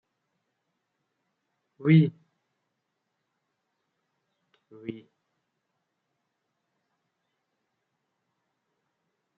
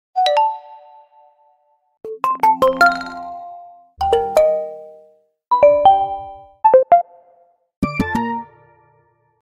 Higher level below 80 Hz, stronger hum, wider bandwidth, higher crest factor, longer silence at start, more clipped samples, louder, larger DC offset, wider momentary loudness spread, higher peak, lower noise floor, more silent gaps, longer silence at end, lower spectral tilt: second, -78 dBFS vs -46 dBFS; neither; second, 4.3 kHz vs 16 kHz; first, 26 dB vs 18 dB; first, 1.8 s vs 0.15 s; neither; second, -23 LUFS vs -16 LUFS; neither; about the same, 20 LU vs 21 LU; second, -8 dBFS vs 0 dBFS; first, -81 dBFS vs -60 dBFS; second, none vs 7.77-7.82 s; first, 4.4 s vs 0.95 s; first, -8.5 dB/octave vs -5.5 dB/octave